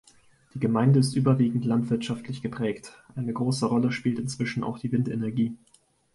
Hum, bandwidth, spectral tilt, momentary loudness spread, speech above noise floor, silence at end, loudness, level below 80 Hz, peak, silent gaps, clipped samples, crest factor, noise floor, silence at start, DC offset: none; 11.5 kHz; -7 dB/octave; 12 LU; 33 dB; 0.6 s; -26 LUFS; -62 dBFS; -10 dBFS; none; under 0.1%; 16 dB; -58 dBFS; 0.55 s; under 0.1%